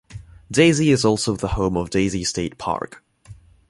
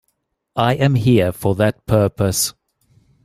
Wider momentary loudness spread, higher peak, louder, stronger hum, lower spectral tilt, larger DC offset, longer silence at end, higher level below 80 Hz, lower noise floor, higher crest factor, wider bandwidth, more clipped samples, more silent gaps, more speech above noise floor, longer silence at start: first, 11 LU vs 5 LU; about the same, -2 dBFS vs 0 dBFS; second, -20 LUFS vs -17 LUFS; neither; about the same, -5 dB/octave vs -5.5 dB/octave; neither; second, 0.35 s vs 0.75 s; about the same, -40 dBFS vs -44 dBFS; second, -45 dBFS vs -71 dBFS; about the same, 20 dB vs 18 dB; second, 11.5 kHz vs 16 kHz; neither; neither; second, 26 dB vs 55 dB; second, 0.1 s vs 0.55 s